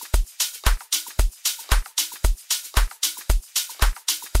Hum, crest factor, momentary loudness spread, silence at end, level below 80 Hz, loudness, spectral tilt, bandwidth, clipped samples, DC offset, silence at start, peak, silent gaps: none; 20 dB; 3 LU; 0 s; -24 dBFS; -24 LUFS; -1.5 dB/octave; 16.5 kHz; under 0.1%; 0.1%; 0 s; -2 dBFS; none